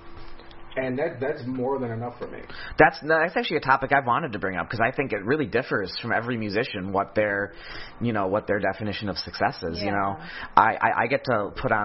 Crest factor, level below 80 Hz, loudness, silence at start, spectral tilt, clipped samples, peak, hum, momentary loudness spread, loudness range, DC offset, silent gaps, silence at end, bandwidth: 26 dB; -50 dBFS; -25 LUFS; 0 s; -8.5 dB/octave; under 0.1%; 0 dBFS; none; 11 LU; 4 LU; under 0.1%; none; 0 s; 6 kHz